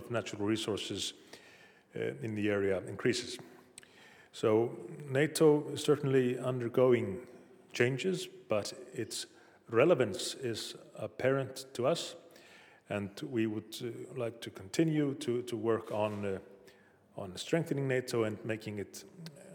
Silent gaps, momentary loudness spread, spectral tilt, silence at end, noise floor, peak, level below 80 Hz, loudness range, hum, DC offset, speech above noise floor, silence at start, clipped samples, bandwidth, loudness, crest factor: none; 18 LU; -5.5 dB/octave; 0 s; -62 dBFS; -12 dBFS; -80 dBFS; 6 LU; none; under 0.1%; 28 dB; 0 s; under 0.1%; 18.5 kHz; -34 LUFS; 22 dB